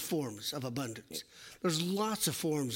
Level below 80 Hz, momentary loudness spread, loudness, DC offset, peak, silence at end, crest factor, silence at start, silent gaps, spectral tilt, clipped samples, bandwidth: -72 dBFS; 11 LU; -35 LUFS; under 0.1%; -18 dBFS; 0 s; 18 dB; 0 s; none; -4 dB/octave; under 0.1%; 16.5 kHz